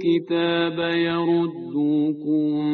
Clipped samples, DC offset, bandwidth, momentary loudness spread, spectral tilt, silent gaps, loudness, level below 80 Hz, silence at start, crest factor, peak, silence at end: under 0.1%; under 0.1%; 4.5 kHz; 2 LU; -4.5 dB/octave; none; -22 LUFS; -64 dBFS; 0 s; 12 dB; -10 dBFS; 0 s